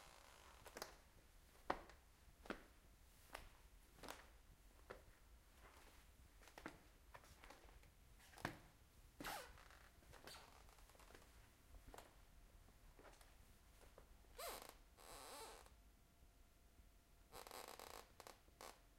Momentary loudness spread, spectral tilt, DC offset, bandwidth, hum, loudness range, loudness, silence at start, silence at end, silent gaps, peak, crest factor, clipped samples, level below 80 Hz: 15 LU; -3 dB/octave; under 0.1%; 16 kHz; none; 7 LU; -60 LUFS; 0 s; 0 s; none; -24 dBFS; 36 dB; under 0.1%; -70 dBFS